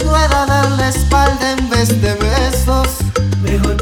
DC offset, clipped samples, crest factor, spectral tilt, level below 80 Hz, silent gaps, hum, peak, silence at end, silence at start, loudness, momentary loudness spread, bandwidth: under 0.1%; under 0.1%; 12 dB; -5 dB/octave; -18 dBFS; none; none; 0 dBFS; 0 s; 0 s; -14 LUFS; 4 LU; 17.5 kHz